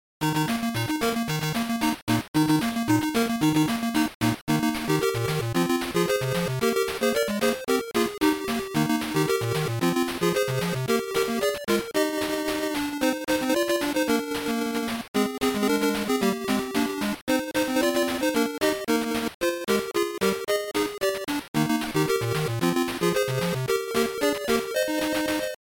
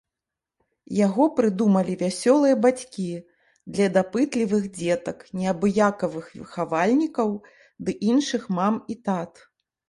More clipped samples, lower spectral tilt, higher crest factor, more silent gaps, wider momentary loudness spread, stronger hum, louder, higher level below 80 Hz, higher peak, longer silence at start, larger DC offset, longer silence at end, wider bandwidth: neither; second, -4.5 dB/octave vs -6 dB/octave; second, 12 dB vs 18 dB; first, 2.02-2.07 s, 2.28-2.34 s, 4.15-4.20 s, 4.41-4.47 s, 15.08-15.14 s, 17.21-17.27 s, 19.34-19.41 s, 21.48-21.54 s vs none; second, 3 LU vs 12 LU; neither; about the same, -25 LUFS vs -23 LUFS; first, -54 dBFS vs -64 dBFS; second, -14 dBFS vs -6 dBFS; second, 0.2 s vs 0.9 s; neither; second, 0.2 s vs 0.6 s; first, 17 kHz vs 11.5 kHz